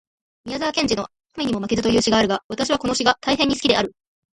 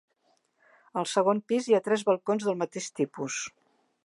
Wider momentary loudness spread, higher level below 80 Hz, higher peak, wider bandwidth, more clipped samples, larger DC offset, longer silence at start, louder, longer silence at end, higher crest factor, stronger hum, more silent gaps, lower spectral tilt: about the same, 10 LU vs 9 LU; first, -48 dBFS vs -82 dBFS; first, 0 dBFS vs -10 dBFS; about the same, 11.5 kHz vs 11.5 kHz; neither; neither; second, 0.45 s vs 0.95 s; first, -20 LUFS vs -28 LUFS; about the same, 0.45 s vs 0.55 s; about the same, 20 dB vs 18 dB; neither; first, 2.44-2.50 s vs none; about the same, -3.5 dB/octave vs -4.5 dB/octave